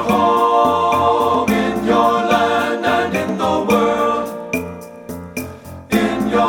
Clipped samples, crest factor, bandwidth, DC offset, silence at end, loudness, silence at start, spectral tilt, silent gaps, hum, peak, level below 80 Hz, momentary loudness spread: under 0.1%; 14 dB; 19.5 kHz; under 0.1%; 0 s; -16 LUFS; 0 s; -5 dB/octave; none; none; -2 dBFS; -46 dBFS; 14 LU